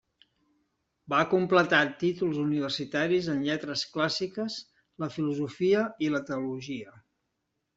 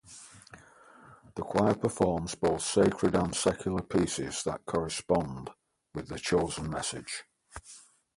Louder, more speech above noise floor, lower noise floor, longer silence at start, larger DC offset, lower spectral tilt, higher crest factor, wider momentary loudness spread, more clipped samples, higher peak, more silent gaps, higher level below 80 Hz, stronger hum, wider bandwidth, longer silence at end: about the same, -28 LUFS vs -30 LUFS; first, 53 dB vs 26 dB; first, -81 dBFS vs -56 dBFS; first, 1.1 s vs 0.05 s; neither; about the same, -5.5 dB/octave vs -5 dB/octave; about the same, 22 dB vs 20 dB; second, 12 LU vs 21 LU; neither; about the same, -8 dBFS vs -10 dBFS; neither; second, -70 dBFS vs -52 dBFS; neither; second, 8 kHz vs 11.5 kHz; first, 0.75 s vs 0.35 s